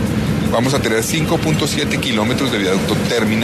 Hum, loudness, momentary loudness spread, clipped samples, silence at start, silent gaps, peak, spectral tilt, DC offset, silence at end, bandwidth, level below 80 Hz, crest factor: none; -16 LUFS; 1 LU; under 0.1%; 0 s; none; -4 dBFS; -5 dB/octave; under 0.1%; 0 s; 13.5 kHz; -36 dBFS; 12 dB